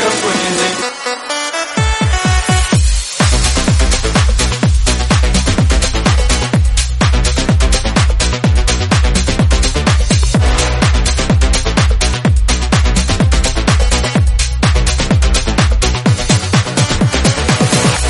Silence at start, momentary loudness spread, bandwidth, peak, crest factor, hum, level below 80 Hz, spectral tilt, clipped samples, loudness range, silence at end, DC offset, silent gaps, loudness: 0 s; 2 LU; 11.5 kHz; 0 dBFS; 12 dB; none; -14 dBFS; -4 dB/octave; under 0.1%; 1 LU; 0 s; under 0.1%; none; -13 LUFS